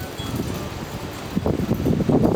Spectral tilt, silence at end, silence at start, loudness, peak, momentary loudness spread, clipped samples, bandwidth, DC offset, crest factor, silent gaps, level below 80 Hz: -7 dB/octave; 0 s; 0 s; -24 LUFS; -4 dBFS; 11 LU; under 0.1%; over 20 kHz; under 0.1%; 18 dB; none; -38 dBFS